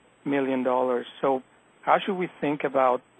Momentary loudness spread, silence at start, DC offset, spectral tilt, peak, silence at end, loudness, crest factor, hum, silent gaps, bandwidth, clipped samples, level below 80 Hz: 6 LU; 0.25 s; under 0.1%; -7.5 dB/octave; -6 dBFS; 0.2 s; -26 LUFS; 20 dB; none; none; 8.4 kHz; under 0.1%; -76 dBFS